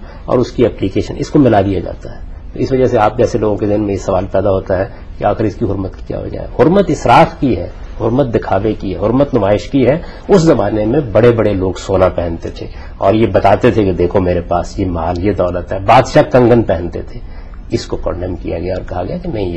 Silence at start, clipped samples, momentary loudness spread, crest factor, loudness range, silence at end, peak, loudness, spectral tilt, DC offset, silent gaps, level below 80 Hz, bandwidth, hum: 0 s; under 0.1%; 13 LU; 12 dB; 3 LU; 0 s; 0 dBFS; -13 LUFS; -7.5 dB/octave; under 0.1%; none; -28 dBFS; 10 kHz; none